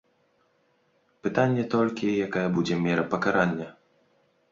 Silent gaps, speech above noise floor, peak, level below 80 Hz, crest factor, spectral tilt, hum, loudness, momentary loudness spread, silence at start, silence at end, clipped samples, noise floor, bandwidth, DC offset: none; 43 dB; -8 dBFS; -62 dBFS; 20 dB; -7 dB/octave; none; -26 LUFS; 7 LU; 1.25 s; 0.8 s; under 0.1%; -68 dBFS; 7.6 kHz; under 0.1%